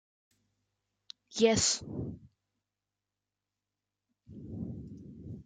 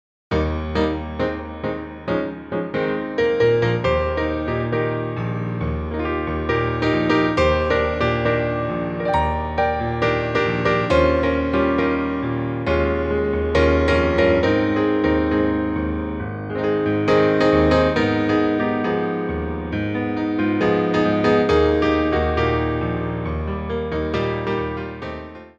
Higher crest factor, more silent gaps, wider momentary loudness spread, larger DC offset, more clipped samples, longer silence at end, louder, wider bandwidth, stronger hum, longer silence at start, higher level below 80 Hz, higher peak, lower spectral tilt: first, 24 dB vs 16 dB; neither; first, 26 LU vs 8 LU; neither; neither; about the same, 0.05 s vs 0.1 s; second, -31 LUFS vs -20 LUFS; first, 9.8 kHz vs 8.4 kHz; first, 50 Hz at -65 dBFS vs none; first, 1.3 s vs 0.3 s; second, -62 dBFS vs -32 dBFS; second, -12 dBFS vs -4 dBFS; second, -3 dB/octave vs -7.5 dB/octave